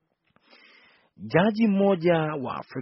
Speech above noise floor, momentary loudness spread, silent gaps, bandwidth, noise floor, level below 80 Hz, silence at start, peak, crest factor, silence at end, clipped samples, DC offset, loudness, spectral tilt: 43 dB; 11 LU; none; 5.8 kHz; -66 dBFS; -66 dBFS; 1.2 s; -6 dBFS; 20 dB; 0 s; under 0.1%; under 0.1%; -24 LUFS; -6 dB/octave